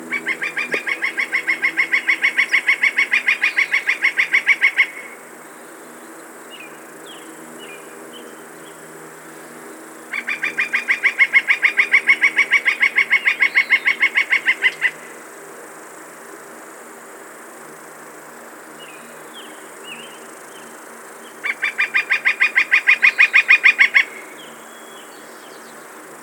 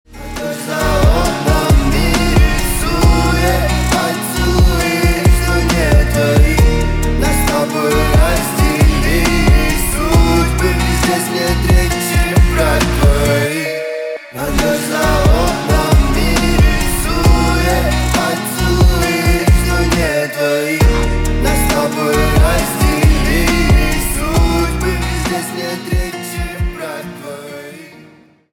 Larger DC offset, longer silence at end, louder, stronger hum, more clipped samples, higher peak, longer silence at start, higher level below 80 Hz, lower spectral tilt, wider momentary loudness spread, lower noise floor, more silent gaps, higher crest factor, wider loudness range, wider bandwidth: neither; second, 0 s vs 0.65 s; about the same, -15 LUFS vs -14 LUFS; neither; neither; about the same, 0 dBFS vs 0 dBFS; about the same, 0 s vs 0.1 s; second, -82 dBFS vs -16 dBFS; second, 0 dB/octave vs -5 dB/octave; first, 24 LU vs 8 LU; second, -38 dBFS vs -44 dBFS; neither; first, 20 dB vs 12 dB; first, 23 LU vs 2 LU; about the same, 18 kHz vs 18.5 kHz